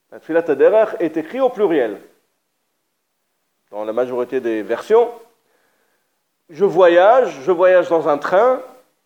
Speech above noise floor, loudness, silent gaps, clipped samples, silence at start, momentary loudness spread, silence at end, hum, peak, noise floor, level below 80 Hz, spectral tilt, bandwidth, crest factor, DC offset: 56 dB; -16 LUFS; none; under 0.1%; 0.1 s; 11 LU; 0.4 s; none; 0 dBFS; -71 dBFS; -76 dBFS; -6 dB/octave; 8.8 kHz; 16 dB; under 0.1%